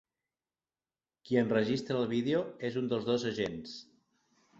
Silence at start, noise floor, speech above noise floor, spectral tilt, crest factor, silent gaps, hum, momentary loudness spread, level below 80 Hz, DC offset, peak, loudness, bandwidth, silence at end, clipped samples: 1.25 s; under -90 dBFS; over 58 dB; -6.5 dB/octave; 20 dB; none; none; 10 LU; -70 dBFS; under 0.1%; -16 dBFS; -32 LUFS; 7.8 kHz; 0.75 s; under 0.1%